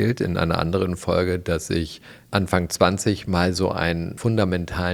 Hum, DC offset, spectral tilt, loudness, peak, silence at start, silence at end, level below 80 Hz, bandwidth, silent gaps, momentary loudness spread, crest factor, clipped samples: none; under 0.1%; -5.5 dB/octave; -23 LUFS; -2 dBFS; 0 s; 0 s; -46 dBFS; 16 kHz; none; 6 LU; 22 dB; under 0.1%